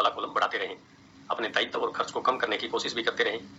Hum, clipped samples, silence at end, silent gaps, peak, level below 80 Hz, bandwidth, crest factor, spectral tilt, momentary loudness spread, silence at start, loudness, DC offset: none; under 0.1%; 0 s; none; -8 dBFS; -70 dBFS; 8.2 kHz; 20 dB; -2.5 dB/octave; 6 LU; 0 s; -29 LUFS; under 0.1%